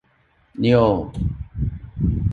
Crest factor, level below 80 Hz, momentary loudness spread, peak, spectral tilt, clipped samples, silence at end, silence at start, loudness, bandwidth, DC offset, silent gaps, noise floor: 18 dB; -32 dBFS; 12 LU; -4 dBFS; -9.5 dB/octave; under 0.1%; 0 s; 0.55 s; -21 LUFS; 7.4 kHz; under 0.1%; none; -60 dBFS